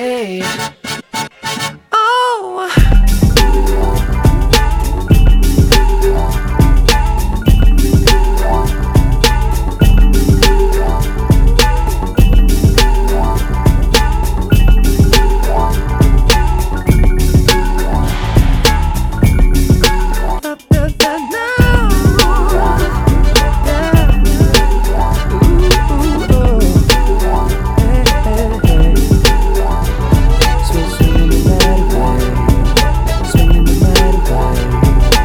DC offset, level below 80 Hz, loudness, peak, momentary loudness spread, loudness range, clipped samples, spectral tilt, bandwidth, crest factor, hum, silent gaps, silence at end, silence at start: under 0.1%; -12 dBFS; -12 LUFS; 0 dBFS; 6 LU; 1 LU; 0.4%; -5 dB/octave; 17.5 kHz; 10 dB; none; none; 0 s; 0 s